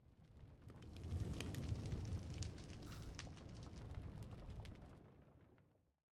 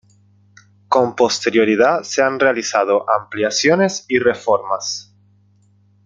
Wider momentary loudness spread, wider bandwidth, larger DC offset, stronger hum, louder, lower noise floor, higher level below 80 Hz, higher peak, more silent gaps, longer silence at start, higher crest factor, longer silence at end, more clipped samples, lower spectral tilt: first, 17 LU vs 5 LU; first, 13.5 kHz vs 9.2 kHz; neither; second, none vs 50 Hz at -45 dBFS; second, -51 LUFS vs -16 LUFS; first, -74 dBFS vs -55 dBFS; about the same, -58 dBFS vs -62 dBFS; second, -28 dBFS vs -2 dBFS; neither; second, 0 s vs 0.9 s; first, 22 dB vs 16 dB; second, 0.5 s vs 1.05 s; neither; first, -6 dB/octave vs -3.5 dB/octave